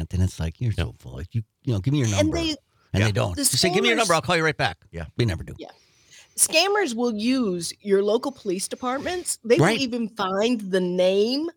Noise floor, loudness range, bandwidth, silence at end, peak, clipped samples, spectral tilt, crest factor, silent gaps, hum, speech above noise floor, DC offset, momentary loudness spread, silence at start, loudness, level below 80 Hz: -53 dBFS; 2 LU; 19.5 kHz; 0.05 s; -4 dBFS; under 0.1%; -4 dB/octave; 20 dB; none; none; 30 dB; under 0.1%; 13 LU; 0 s; -23 LUFS; -48 dBFS